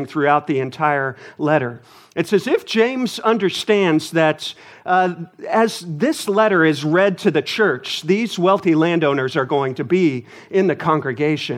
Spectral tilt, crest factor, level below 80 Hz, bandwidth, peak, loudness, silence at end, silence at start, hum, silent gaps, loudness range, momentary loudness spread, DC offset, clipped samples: -5.5 dB/octave; 16 dB; -70 dBFS; 16 kHz; -2 dBFS; -18 LUFS; 0 s; 0 s; none; none; 2 LU; 7 LU; under 0.1%; under 0.1%